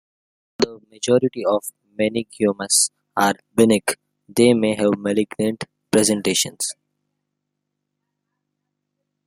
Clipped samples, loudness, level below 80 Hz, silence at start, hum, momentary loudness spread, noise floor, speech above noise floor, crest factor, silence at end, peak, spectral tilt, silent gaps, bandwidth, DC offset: under 0.1%; -20 LUFS; -62 dBFS; 0.6 s; 50 Hz at -50 dBFS; 10 LU; -79 dBFS; 60 dB; 20 dB; 2.55 s; -2 dBFS; -3.5 dB/octave; none; 16 kHz; under 0.1%